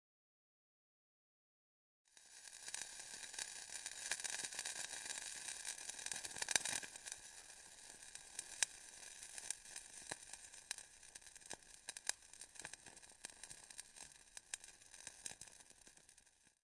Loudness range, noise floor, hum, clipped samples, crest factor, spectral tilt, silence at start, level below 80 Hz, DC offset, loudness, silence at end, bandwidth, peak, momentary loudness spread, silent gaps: 10 LU; -71 dBFS; none; under 0.1%; 38 dB; 1.5 dB/octave; 2.1 s; -80 dBFS; under 0.1%; -47 LUFS; 0.15 s; 12 kHz; -12 dBFS; 15 LU; none